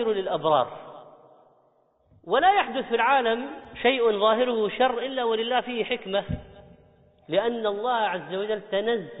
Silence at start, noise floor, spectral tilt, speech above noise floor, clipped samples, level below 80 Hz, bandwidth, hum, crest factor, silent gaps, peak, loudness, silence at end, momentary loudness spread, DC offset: 0 s; -65 dBFS; -2 dB/octave; 40 dB; under 0.1%; -56 dBFS; 4 kHz; none; 16 dB; none; -8 dBFS; -25 LUFS; 0 s; 9 LU; under 0.1%